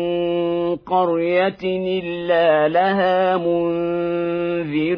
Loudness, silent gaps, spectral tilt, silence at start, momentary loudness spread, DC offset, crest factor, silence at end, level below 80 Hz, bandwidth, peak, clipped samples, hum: -19 LUFS; none; -9 dB/octave; 0 s; 6 LU; under 0.1%; 14 dB; 0 s; -56 dBFS; 5.2 kHz; -6 dBFS; under 0.1%; none